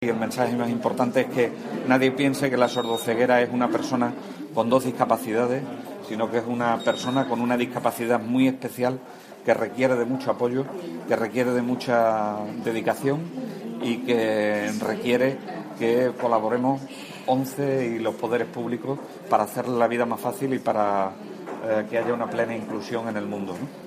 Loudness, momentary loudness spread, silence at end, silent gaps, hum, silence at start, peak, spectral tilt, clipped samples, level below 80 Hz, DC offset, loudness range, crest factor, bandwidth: -25 LUFS; 9 LU; 0 s; none; none; 0 s; -4 dBFS; -5.5 dB/octave; under 0.1%; -70 dBFS; under 0.1%; 3 LU; 20 dB; 15.5 kHz